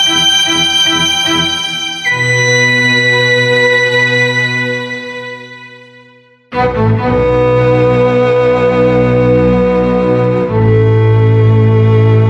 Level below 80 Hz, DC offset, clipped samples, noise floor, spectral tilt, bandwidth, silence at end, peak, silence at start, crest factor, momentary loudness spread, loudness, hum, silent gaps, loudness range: -32 dBFS; under 0.1%; under 0.1%; -43 dBFS; -4.5 dB/octave; 13.5 kHz; 0 s; 0 dBFS; 0 s; 10 dB; 7 LU; -10 LUFS; none; none; 5 LU